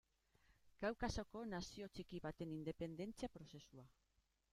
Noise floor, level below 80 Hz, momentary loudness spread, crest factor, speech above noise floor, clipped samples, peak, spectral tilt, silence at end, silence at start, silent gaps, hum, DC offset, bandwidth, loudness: -84 dBFS; -64 dBFS; 14 LU; 22 dB; 35 dB; under 0.1%; -30 dBFS; -5.5 dB/octave; 0.6 s; 0.5 s; none; none; under 0.1%; 15.5 kHz; -49 LUFS